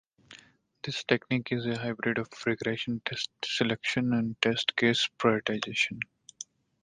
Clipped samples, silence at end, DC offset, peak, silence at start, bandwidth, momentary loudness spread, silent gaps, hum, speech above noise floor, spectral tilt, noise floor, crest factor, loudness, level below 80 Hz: under 0.1%; 0.4 s; under 0.1%; -6 dBFS; 0.3 s; 9.6 kHz; 13 LU; none; none; 29 dB; -4.5 dB/octave; -58 dBFS; 24 dB; -29 LUFS; -66 dBFS